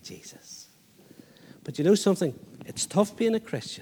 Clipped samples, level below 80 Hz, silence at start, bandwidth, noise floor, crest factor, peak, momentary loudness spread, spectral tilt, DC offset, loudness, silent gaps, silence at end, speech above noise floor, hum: under 0.1%; -72 dBFS; 0.05 s; 20 kHz; -56 dBFS; 20 dB; -8 dBFS; 22 LU; -5 dB/octave; under 0.1%; -26 LUFS; none; 0 s; 29 dB; none